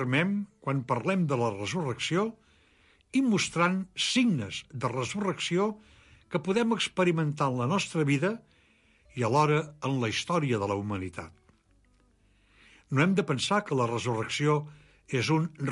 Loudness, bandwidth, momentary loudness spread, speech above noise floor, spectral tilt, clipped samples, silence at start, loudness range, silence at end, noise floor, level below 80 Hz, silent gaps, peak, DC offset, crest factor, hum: -28 LUFS; 11.5 kHz; 8 LU; 37 dB; -5.5 dB/octave; under 0.1%; 0 s; 3 LU; 0 s; -65 dBFS; -62 dBFS; none; -12 dBFS; under 0.1%; 18 dB; none